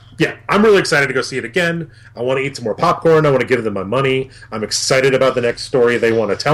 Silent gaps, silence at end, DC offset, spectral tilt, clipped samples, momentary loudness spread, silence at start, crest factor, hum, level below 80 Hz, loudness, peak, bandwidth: none; 0 s; under 0.1%; -4.5 dB/octave; under 0.1%; 9 LU; 0.1 s; 10 dB; none; -48 dBFS; -15 LUFS; -4 dBFS; 15 kHz